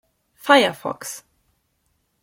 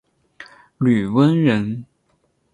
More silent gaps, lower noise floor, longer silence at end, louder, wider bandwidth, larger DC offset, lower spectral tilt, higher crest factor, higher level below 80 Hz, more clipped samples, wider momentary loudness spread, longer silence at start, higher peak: neither; first, -69 dBFS vs -65 dBFS; first, 1.05 s vs 0.7 s; about the same, -18 LUFS vs -18 LUFS; first, 17 kHz vs 11 kHz; neither; second, -2.5 dB/octave vs -8.5 dB/octave; first, 22 dB vs 16 dB; second, -68 dBFS vs -56 dBFS; neither; first, 18 LU vs 11 LU; about the same, 0.45 s vs 0.4 s; about the same, -2 dBFS vs -4 dBFS